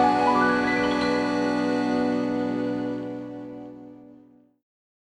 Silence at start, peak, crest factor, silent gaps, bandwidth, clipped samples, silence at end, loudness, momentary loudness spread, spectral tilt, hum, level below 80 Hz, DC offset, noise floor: 0 s; -8 dBFS; 16 dB; none; 10.5 kHz; under 0.1%; 0.95 s; -24 LUFS; 18 LU; -5.5 dB/octave; none; -56 dBFS; under 0.1%; -54 dBFS